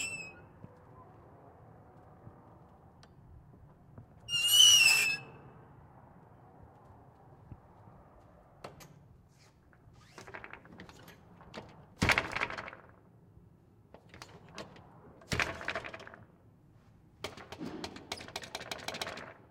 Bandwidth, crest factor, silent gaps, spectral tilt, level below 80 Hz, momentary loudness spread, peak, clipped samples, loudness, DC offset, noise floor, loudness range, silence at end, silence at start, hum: 16 kHz; 26 dB; none; -0.5 dB/octave; -62 dBFS; 31 LU; -10 dBFS; under 0.1%; -28 LUFS; under 0.1%; -62 dBFS; 20 LU; 0.15 s; 0 s; none